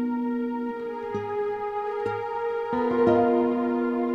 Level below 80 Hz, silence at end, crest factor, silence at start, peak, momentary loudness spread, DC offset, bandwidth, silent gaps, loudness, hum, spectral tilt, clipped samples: -60 dBFS; 0 s; 16 dB; 0 s; -8 dBFS; 10 LU; under 0.1%; 6.2 kHz; none; -26 LUFS; none; -8.5 dB/octave; under 0.1%